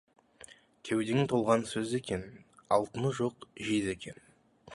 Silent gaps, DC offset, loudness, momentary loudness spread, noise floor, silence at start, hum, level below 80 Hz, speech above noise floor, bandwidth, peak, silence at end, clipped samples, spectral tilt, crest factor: none; under 0.1%; -32 LUFS; 20 LU; -56 dBFS; 0.5 s; none; -62 dBFS; 25 dB; 11.5 kHz; -12 dBFS; 0 s; under 0.1%; -5.5 dB/octave; 22 dB